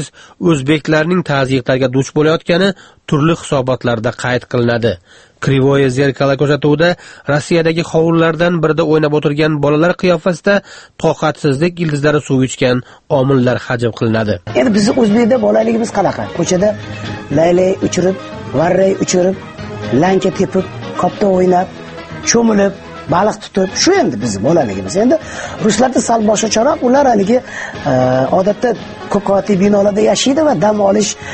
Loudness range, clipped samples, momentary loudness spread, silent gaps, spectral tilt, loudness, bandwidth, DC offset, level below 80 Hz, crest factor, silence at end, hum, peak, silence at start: 2 LU; under 0.1%; 7 LU; none; -5.5 dB/octave; -13 LUFS; 8.8 kHz; under 0.1%; -42 dBFS; 12 dB; 0 s; none; 0 dBFS; 0 s